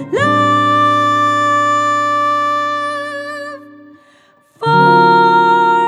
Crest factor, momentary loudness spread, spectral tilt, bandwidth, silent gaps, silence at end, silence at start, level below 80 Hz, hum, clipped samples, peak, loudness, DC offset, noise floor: 12 dB; 13 LU; -5 dB/octave; 12 kHz; none; 0 s; 0 s; -68 dBFS; none; under 0.1%; 0 dBFS; -12 LUFS; under 0.1%; -50 dBFS